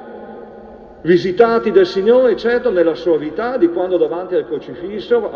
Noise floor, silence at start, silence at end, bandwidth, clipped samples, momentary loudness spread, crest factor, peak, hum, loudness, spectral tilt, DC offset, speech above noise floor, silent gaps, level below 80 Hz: -37 dBFS; 0 s; 0 s; 6.8 kHz; under 0.1%; 16 LU; 14 dB; 0 dBFS; none; -15 LUFS; -7 dB/octave; under 0.1%; 22 dB; none; -50 dBFS